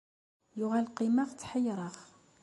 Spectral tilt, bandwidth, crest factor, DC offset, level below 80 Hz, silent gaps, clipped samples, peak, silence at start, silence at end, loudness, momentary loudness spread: -6 dB/octave; 11.5 kHz; 14 dB; under 0.1%; -74 dBFS; none; under 0.1%; -20 dBFS; 0.55 s; 0.4 s; -33 LUFS; 15 LU